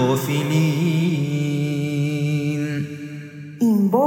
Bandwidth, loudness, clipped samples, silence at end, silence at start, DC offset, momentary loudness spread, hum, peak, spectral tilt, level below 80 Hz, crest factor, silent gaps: 18 kHz; -21 LUFS; under 0.1%; 0 s; 0 s; under 0.1%; 13 LU; none; -6 dBFS; -7 dB/octave; -72 dBFS; 14 dB; none